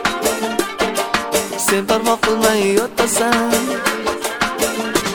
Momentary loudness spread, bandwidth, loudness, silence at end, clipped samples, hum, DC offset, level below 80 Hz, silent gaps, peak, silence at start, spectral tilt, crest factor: 5 LU; 17.5 kHz; -17 LUFS; 0 s; under 0.1%; none; under 0.1%; -46 dBFS; none; 0 dBFS; 0 s; -2.5 dB/octave; 18 dB